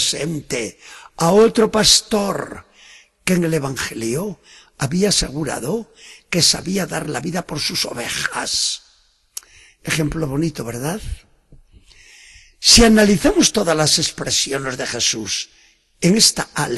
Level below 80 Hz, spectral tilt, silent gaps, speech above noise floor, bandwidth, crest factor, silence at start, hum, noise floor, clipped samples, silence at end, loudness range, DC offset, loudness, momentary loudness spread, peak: -38 dBFS; -3 dB/octave; none; 38 dB; 13 kHz; 20 dB; 0 s; none; -57 dBFS; under 0.1%; 0 s; 8 LU; under 0.1%; -17 LUFS; 17 LU; 0 dBFS